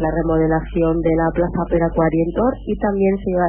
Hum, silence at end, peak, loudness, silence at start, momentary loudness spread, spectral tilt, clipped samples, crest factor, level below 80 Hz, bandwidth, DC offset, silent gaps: none; 0 s; -6 dBFS; -18 LUFS; 0 s; 3 LU; -13 dB/octave; under 0.1%; 12 dB; -30 dBFS; 3.4 kHz; under 0.1%; none